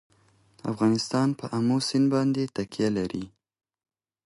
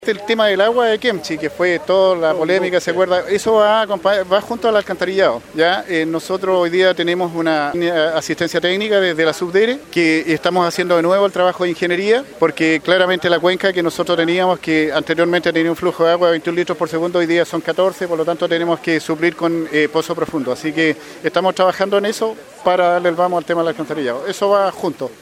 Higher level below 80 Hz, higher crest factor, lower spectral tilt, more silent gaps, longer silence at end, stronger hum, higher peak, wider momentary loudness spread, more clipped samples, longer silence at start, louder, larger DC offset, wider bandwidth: second, -62 dBFS vs -56 dBFS; about the same, 14 dB vs 16 dB; first, -6 dB/octave vs -4.5 dB/octave; neither; first, 1 s vs 0.1 s; neither; second, -12 dBFS vs 0 dBFS; first, 11 LU vs 5 LU; neither; first, 0.65 s vs 0 s; second, -26 LUFS vs -16 LUFS; neither; second, 11.5 kHz vs 16 kHz